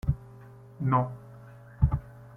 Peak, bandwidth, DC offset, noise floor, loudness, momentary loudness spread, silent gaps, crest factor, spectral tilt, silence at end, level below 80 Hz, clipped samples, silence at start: -10 dBFS; 3.4 kHz; under 0.1%; -49 dBFS; -30 LUFS; 23 LU; none; 22 dB; -10.5 dB/octave; 0 s; -38 dBFS; under 0.1%; 0.05 s